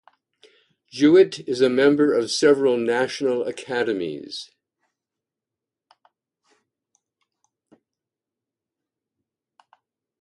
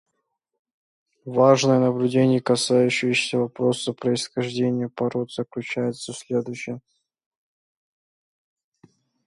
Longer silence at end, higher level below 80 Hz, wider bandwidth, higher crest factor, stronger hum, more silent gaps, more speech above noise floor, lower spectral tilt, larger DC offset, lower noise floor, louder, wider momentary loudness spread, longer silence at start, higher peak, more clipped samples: first, 5.8 s vs 2.5 s; about the same, -70 dBFS vs -68 dBFS; about the same, 11.5 kHz vs 11.5 kHz; about the same, 20 dB vs 20 dB; neither; neither; first, 68 dB vs 55 dB; about the same, -4.5 dB/octave vs -5 dB/octave; neither; first, -87 dBFS vs -77 dBFS; about the same, -20 LUFS vs -22 LUFS; about the same, 15 LU vs 13 LU; second, 0.95 s vs 1.25 s; about the same, -4 dBFS vs -4 dBFS; neither